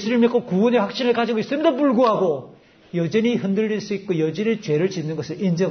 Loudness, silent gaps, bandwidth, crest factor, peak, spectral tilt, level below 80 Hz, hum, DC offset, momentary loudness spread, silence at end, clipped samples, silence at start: -21 LUFS; none; 6.6 kHz; 14 dB; -6 dBFS; -7 dB/octave; -66 dBFS; none; under 0.1%; 8 LU; 0 s; under 0.1%; 0 s